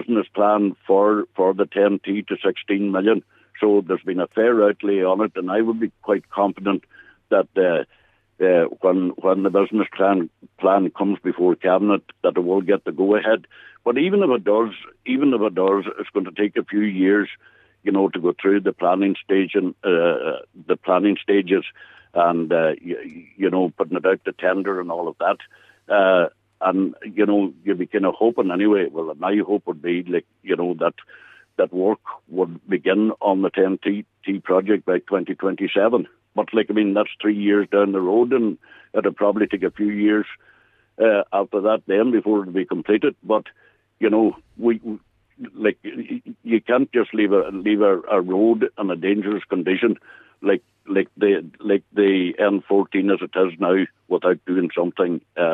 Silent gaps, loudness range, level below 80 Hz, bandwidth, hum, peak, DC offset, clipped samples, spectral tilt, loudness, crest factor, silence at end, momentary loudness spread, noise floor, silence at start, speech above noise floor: none; 3 LU; -70 dBFS; 4 kHz; none; -4 dBFS; under 0.1%; under 0.1%; -9 dB/octave; -20 LUFS; 16 dB; 0 s; 7 LU; -57 dBFS; 0 s; 37 dB